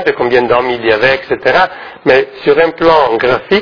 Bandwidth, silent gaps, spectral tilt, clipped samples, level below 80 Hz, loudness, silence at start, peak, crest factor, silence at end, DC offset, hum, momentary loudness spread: 5.4 kHz; none; -6 dB/octave; 0.4%; -42 dBFS; -11 LUFS; 0 s; 0 dBFS; 10 dB; 0 s; under 0.1%; none; 4 LU